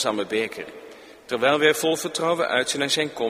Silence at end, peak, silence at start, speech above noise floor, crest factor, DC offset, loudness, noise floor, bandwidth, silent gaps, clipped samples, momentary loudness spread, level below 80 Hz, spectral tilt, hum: 0 s; -4 dBFS; 0 s; 21 dB; 20 dB; under 0.1%; -22 LUFS; -44 dBFS; 15.5 kHz; none; under 0.1%; 14 LU; -66 dBFS; -2.5 dB/octave; none